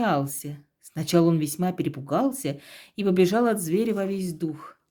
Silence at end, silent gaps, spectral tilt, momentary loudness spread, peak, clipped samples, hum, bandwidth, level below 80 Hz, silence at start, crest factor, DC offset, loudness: 0.2 s; none; -6 dB/octave; 18 LU; -8 dBFS; under 0.1%; none; over 20 kHz; -66 dBFS; 0 s; 18 dB; under 0.1%; -25 LUFS